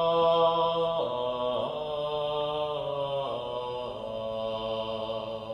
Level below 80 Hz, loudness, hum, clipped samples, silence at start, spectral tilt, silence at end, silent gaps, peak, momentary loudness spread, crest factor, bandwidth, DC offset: -58 dBFS; -30 LUFS; none; under 0.1%; 0 s; -6.5 dB/octave; 0 s; none; -14 dBFS; 10 LU; 14 dB; 10 kHz; under 0.1%